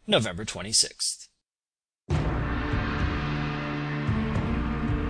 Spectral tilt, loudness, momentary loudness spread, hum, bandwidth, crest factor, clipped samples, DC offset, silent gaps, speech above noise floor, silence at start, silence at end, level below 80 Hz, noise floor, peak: -4 dB/octave; -27 LUFS; 8 LU; none; 11 kHz; 20 dB; under 0.1%; under 0.1%; none; over 63 dB; 0.05 s; 0 s; -36 dBFS; under -90 dBFS; -8 dBFS